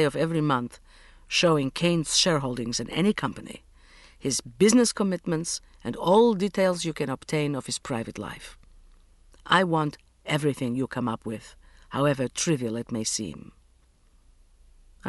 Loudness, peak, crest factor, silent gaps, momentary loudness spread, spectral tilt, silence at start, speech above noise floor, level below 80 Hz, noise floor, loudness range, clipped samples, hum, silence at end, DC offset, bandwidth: -25 LUFS; -6 dBFS; 22 dB; none; 16 LU; -4.5 dB/octave; 0 s; 34 dB; -54 dBFS; -60 dBFS; 6 LU; under 0.1%; none; 0 s; under 0.1%; 11.5 kHz